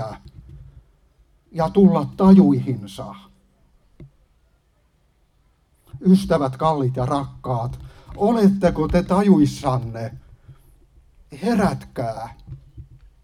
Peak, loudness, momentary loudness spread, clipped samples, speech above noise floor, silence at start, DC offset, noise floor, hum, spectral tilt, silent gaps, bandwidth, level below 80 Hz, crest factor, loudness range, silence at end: -2 dBFS; -19 LUFS; 20 LU; under 0.1%; 43 dB; 0 s; under 0.1%; -62 dBFS; none; -8 dB/octave; none; 11 kHz; -42 dBFS; 18 dB; 7 LU; 0.4 s